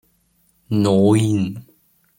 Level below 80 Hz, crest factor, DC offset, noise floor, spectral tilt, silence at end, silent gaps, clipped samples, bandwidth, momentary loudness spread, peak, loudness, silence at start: -56 dBFS; 16 dB; under 0.1%; -62 dBFS; -7 dB/octave; 0.55 s; none; under 0.1%; 16.5 kHz; 12 LU; -4 dBFS; -18 LUFS; 0.7 s